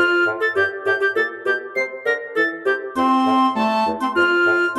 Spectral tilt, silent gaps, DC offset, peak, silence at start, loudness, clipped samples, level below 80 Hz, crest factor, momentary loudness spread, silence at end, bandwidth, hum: -4.5 dB/octave; none; under 0.1%; -6 dBFS; 0 s; -19 LUFS; under 0.1%; -62 dBFS; 12 dB; 6 LU; 0 s; 13.5 kHz; none